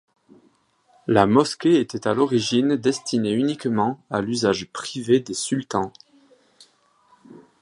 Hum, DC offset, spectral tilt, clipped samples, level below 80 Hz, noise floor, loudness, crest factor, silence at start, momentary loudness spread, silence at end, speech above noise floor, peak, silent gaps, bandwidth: none; under 0.1%; -5 dB/octave; under 0.1%; -58 dBFS; -61 dBFS; -22 LUFS; 22 dB; 1.1 s; 9 LU; 0.2 s; 40 dB; -2 dBFS; none; 11.5 kHz